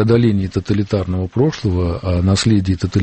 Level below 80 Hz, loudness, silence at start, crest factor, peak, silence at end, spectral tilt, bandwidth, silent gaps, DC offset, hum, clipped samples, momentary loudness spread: -34 dBFS; -17 LUFS; 0 s; 14 dB; -2 dBFS; 0 s; -7 dB/octave; 8.8 kHz; none; under 0.1%; none; under 0.1%; 5 LU